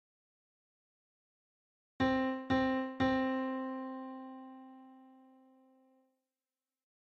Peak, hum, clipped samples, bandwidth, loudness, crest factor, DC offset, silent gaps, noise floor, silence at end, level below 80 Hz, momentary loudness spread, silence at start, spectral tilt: -20 dBFS; none; under 0.1%; 6.6 kHz; -35 LUFS; 18 dB; under 0.1%; none; under -90 dBFS; 1.9 s; -64 dBFS; 20 LU; 2 s; -7 dB/octave